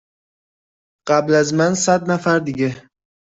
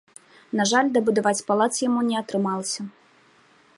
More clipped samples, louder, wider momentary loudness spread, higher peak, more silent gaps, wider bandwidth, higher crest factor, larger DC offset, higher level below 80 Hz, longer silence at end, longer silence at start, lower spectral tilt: neither; first, -17 LUFS vs -23 LUFS; about the same, 8 LU vs 10 LU; about the same, -4 dBFS vs -6 dBFS; neither; second, 8.2 kHz vs 11.5 kHz; about the same, 16 dB vs 18 dB; neither; first, -58 dBFS vs -72 dBFS; second, 0.55 s vs 0.9 s; first, 1.05 s vs 0.55 s; about the same, -5 dB/octave vs -4 dB/octave